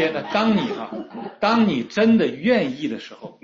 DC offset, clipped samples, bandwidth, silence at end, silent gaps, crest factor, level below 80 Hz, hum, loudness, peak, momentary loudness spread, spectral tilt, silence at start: under 0.1%; under 0.1%; 7.2 kHz; 0.15 s; none; 16 dB; -62 dBFS; none; -20 LUFS; -4 dBFS; 15 LU; -6.5 dB/octave; 0 s